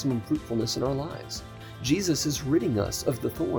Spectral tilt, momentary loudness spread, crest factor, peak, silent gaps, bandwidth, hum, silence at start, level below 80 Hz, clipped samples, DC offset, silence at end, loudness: -5 dB/octave; 11 LU; 18 dB; -10 dBFS; none; over 20 kHz; none; 0 s; -48 dBFS; under 0.1%; under 0.1%; 0 s; -28 LUFS